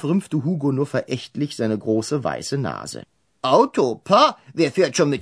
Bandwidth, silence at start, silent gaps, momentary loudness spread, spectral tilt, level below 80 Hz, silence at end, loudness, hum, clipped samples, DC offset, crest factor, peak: 11 kHz; 0 s; none; 11 LU; -5.5 dB/octave; -62 dBFS; 0 s; -21 LUFS; none; under 0.1%; under 0.1%; 20 dB; -2 dBFS